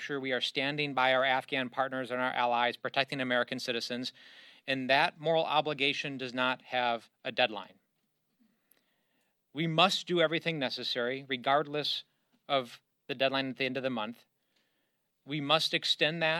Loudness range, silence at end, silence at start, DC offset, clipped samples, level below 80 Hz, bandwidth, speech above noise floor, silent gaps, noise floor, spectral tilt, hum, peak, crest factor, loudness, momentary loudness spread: 5 LU; 0 s; 0 s; under 0.1%; under 0.1%; -84 dBFS; 14 kHz; 47 dB; none; -79 dBFS; -4 dB/octave; none; -8 dBFS; 24 dB; -31 LUFS; 10 LU